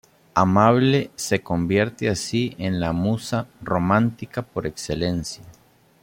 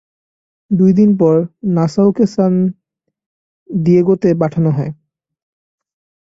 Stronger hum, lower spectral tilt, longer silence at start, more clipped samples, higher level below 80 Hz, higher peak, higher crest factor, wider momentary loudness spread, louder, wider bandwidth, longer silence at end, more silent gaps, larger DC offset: neither; second, -6 dB/octave vs -9.5 dB/octave; second, 0.35 s vs 0.7 s; neither; about the same, -50 dBFS vs -52 dBFS; about the same, -2 dBFS vs -2 dBFS; first, 20 dB vs 14 dB; first, 12 LU vs 9 LU; second, -22 LUFS vs -14 LUFS; first, 16.5 kHz vs 7.6 kHz; second, 0.5 s vs 1.3 s; second, none vs 3.26-3.66 s; neither